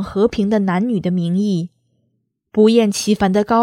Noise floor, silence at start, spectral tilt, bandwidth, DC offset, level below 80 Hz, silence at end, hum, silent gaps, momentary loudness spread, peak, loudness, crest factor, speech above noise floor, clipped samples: -68 dBFS; 0 s; -6 dB/octave; 14.5 kHz; under 0.1%; -48 dBFS; 0 s; none; none; 8 LU; -2 dBFS; -17 LUFS; 16 dB; 53 dB; under 0.1%